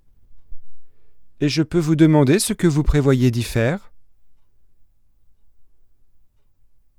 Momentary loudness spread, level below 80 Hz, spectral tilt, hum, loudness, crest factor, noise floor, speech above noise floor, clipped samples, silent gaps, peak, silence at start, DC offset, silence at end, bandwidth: 8 LU; -34 dBFS; -6 dB/octave; none; -18 LUFS; 18 dB; -52 dBFS; 35 dB; under 0.1%; none; -2 dBFS; 0.3 s; under 0.1%; 1.35 s; 16 kHz